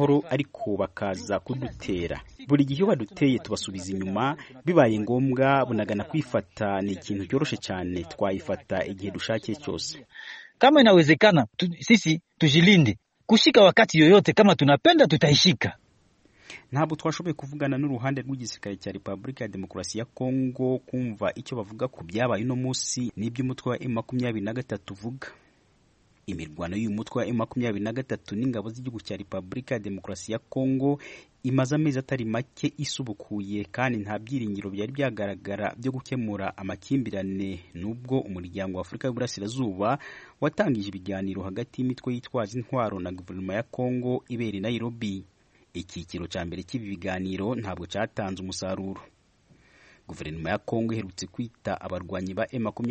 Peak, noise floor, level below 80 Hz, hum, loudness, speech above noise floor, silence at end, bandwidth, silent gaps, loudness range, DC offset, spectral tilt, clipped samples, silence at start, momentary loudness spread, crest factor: -4 dBFS; -63 dBFS; -58 dBFS; none; -26 LUFS; 37 dB; 0 s; 8.4 kHz; none; 14 LU; under 0.1%; -5.5 dB/octave; under 0.1%; 0 s; 17 LU; 22 dB